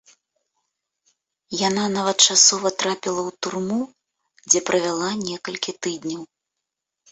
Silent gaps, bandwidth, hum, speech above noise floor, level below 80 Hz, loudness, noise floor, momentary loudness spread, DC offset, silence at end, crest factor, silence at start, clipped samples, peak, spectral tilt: none; 8.4 kHz; none; 61 dB; -66 dBFS; -20 LUFS; -83 dBFS; 15 LU; under 0.1%; 0.85 s; 24 dB; 1.5 s; under 0.1%; 0 dBFS; -1.5 dB/octave